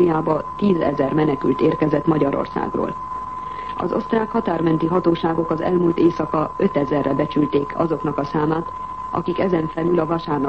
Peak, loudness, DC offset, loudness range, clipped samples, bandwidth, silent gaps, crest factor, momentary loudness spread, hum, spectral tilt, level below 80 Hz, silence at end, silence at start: -4 dBFS; -20 LUFS; 0.4%; 2 LU; under 0.1%; 6.6 kHz; none; 14 dB; 8 LU; none; -9 dB/octave; -46 dBFS; 0 s; 0 s